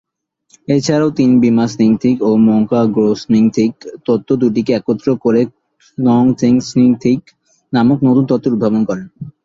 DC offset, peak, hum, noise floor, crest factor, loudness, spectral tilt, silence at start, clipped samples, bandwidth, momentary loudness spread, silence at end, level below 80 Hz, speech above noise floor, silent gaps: under 0.1%; 0 dBFS; none; -59 dBFS; 12 dB; -13 LUFS; -7.5 dB/octave; 0.7 s; under 0.1%; 7.6 kHz; 8 LU; 0.15 s; -52 dBFS; 47 dB; none